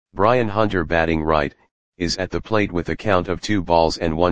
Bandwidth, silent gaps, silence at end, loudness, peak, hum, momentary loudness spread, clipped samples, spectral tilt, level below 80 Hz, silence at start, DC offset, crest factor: 9.8 kHz; 1.71-1.92 s; 0 s; -20 LUFS; 0 dBFS; none; 7 LU; under 0.1%; -5.5 dB/octave; -38 dBFS; 0.05 s; 2%; 20 dB